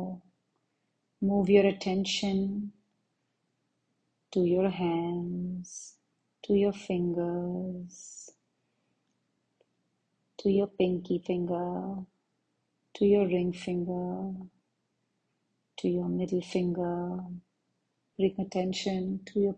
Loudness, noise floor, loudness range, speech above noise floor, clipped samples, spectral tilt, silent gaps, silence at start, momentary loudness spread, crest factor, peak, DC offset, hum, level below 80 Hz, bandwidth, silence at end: -30 LUFS; -79 dBFS; 5 LU; 50 dB; under 0.1%; -6.5 dB/octave; none; 0 s; 18 LU; 22 dB; -10 dBFS; under 0.1%; none; -64 dBFS; 9.2 kHz; 0 s